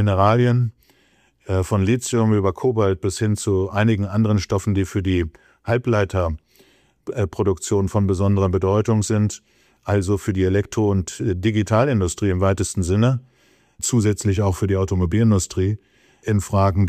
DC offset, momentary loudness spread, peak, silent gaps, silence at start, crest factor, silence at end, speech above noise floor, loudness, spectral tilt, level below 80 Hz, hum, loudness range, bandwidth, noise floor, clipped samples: under 0.1%; 7 LU; -4 dBFS; none; 0 s; 16 dB; 0 s; 40 dB; -20 LUFS; -6.5 dB/octave; -42 dBFS; none; 2 LU; 14.5 kHz; -59 dBFS; under 0.1%